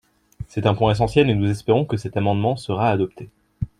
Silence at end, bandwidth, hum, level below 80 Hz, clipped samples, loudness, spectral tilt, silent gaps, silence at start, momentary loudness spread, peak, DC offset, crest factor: 0.15 s; 11 kHz; none; -44 dBFS; under 0.1%; -20 LUFS; -7.5 dB/octave; none; 0.4 s; 10 LU; -2 dBFS; under 0.1%; 18 dB